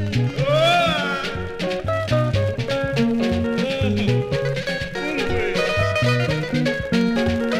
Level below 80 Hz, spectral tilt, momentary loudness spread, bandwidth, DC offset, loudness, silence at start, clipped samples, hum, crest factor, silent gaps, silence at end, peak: -40 dBFS; -6 dB/octave; 7 LU; 15 kHz; under 0.1%; -21 LUFS; 0 s; under 0.1%; none; 14 dB; none; 0 s; -6 dBFS